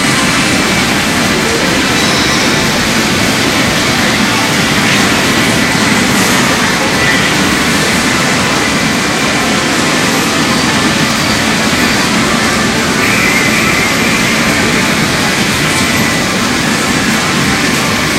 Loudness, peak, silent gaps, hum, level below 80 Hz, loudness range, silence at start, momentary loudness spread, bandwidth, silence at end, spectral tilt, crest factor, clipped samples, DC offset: -9 LUFS; 0 dBFS; none; none; -32 dBFS; 1 LU; 0 s; 2 LU; 16.5 kHz; 0 s; -3 dB/octave; 10 dB; under 0.1%; under 0.1%